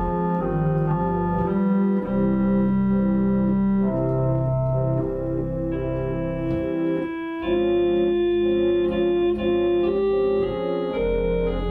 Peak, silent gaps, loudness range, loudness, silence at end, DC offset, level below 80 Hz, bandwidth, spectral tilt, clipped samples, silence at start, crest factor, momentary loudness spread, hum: -12 dBFS; none; 3 LU; -22 LUFS; 0 s; under 0.1%; -36 dBFS; 4.4 kHz; -10.5 dB/octave; under 0.1%; 0 s; 10 dB; 5 LU; none